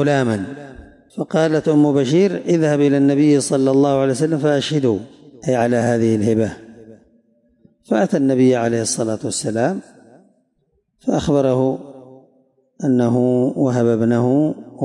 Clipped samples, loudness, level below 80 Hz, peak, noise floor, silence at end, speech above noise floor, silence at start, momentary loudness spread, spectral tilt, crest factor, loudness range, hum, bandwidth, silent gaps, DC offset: under 0.1%; -17 LUFS; -54 dBFS; -6 dBFS; -66 dBFS; 0 s; 50 dB; 0 s; 10 LU; -6 dB/octave; 12 dB; 6 LU; none; 11.5 kHz; none; under 0.1%